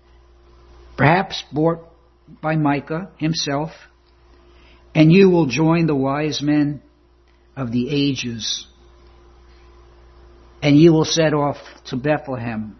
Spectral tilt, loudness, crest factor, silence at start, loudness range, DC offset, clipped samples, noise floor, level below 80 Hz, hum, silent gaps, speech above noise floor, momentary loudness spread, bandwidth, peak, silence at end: -6 dB/octave; -18 LUFS; 20 dB; 1 s; 8 LU; under 0.1%; under 0.1%; -54 dBFS; -48 dBFS; none; none; 36 dB; 16 LU; 6.4 kHz; 0 dBFS; 0.05 s